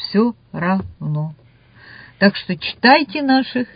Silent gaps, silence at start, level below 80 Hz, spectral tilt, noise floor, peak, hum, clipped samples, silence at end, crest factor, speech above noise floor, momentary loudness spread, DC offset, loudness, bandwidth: none; 0 s; -50 dBFS; -9 dB/octave; -46 dBFS; 0 dBFS; none; under 0.1%; 0.1 s; 18 dB; 29 dB; 12 LU; under 0.1%; -17 LUFS; 5.2 kHz